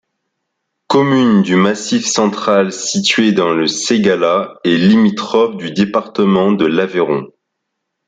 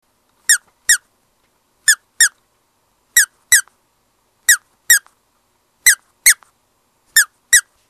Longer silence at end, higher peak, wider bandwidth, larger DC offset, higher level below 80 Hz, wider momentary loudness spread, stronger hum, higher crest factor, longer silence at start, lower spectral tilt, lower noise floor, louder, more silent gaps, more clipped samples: first, 0.8 s vs 0.3 s; about the same, 0 dBFS vs 0 dBFS; second, 9.4 kHz vs over 20 kHz; neither; about the same, -56 dBFS vs -56 dBFS; about the same, 5 LU vs 3 LU; neither; second, 12 dB vs 18 dB; first, 0.9 s vs 0.5 s; first, -4.5 dB/octave vs 5.5 dB/octave; first, -74 dBFS vs -63 dBFS; about the same, -13 LUFS vs -14 LUFS; neither; second, under 0.1% vs 0.1%